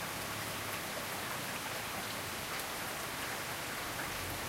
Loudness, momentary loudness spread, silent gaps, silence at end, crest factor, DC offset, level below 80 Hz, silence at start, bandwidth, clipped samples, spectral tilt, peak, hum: -38 LUFS; 0 LU; none; 0 s; 16 dB; under 0.1%; -60 dBFS; 0 s; 16 kHz; under 0.1%; -2 dB/octave; -24 dBFS; none